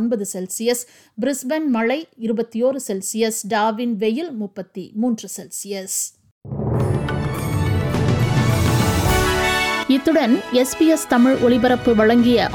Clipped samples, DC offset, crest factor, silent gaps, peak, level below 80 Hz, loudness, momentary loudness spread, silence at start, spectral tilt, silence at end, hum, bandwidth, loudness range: under 0.1%; under 0.1%; 16 dB; 6.31-6.41 s; -4 dBFS; -36 dBFS; -19 LUFS; 12 LU; 0 s; -5 dB/octave; 0 s; none; 18.5 kHz; 8 LU